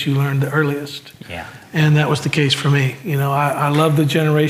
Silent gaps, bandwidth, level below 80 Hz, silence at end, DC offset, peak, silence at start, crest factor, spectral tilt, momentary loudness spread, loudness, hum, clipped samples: none; 15.5 kHz; -56 dBFS; 0 s; under 0.1%; -2 dBFS; 0 s; 14 dB; -6 dB/octave; 16 LU; -17 LUFS; none; under 0.1%